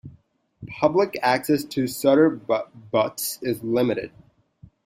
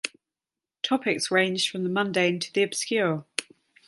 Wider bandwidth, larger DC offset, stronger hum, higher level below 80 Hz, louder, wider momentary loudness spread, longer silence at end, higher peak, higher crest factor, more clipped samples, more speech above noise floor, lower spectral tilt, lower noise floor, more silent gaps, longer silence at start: first, 16 kHz vs 12 kHz; neither; neither; first, -62 dBFS vs -74 dBFS; first, -23 LUFS vs -26 LUFS; about the same, 9 LU vs 10 LU; first, 0.8 s vs 0.45 s; about the same, -4 dBFS vs -2 dBFS; about the same, 20 dB vs 24 dB; neither; second, 35 dB vs over 65 dB; first, -5 dB/octave vs -3.5 dB/octave; second, -57 dBFS vs under -90 dBFS; neither; about the same, 0.05 s vs 0.05 s